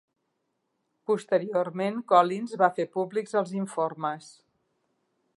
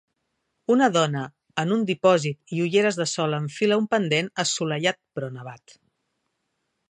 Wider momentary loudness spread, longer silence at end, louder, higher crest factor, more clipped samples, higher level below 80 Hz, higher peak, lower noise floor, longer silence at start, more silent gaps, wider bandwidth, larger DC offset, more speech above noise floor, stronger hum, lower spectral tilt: second, 10 LU vs 13 LU; second, 1.1 s vs 1.35 s; second, -27 LUFS vs -23 LUFS; about the same, 24 dB vs 20 dB; neither; second, -84 dBFS vs -74 dBFS; about the same, -6 dBFS vs -6 dBFS; about the same, -78 dBFS vs -77 dBFS; first, 1.1 s vs 0.7 s; neither; about the same, 11.5 kHz vs 10.5 kHz; neither; about the same, 51 dB vs 53 dB; neither; first, -6 dB/octave vs -4.5 dB/octave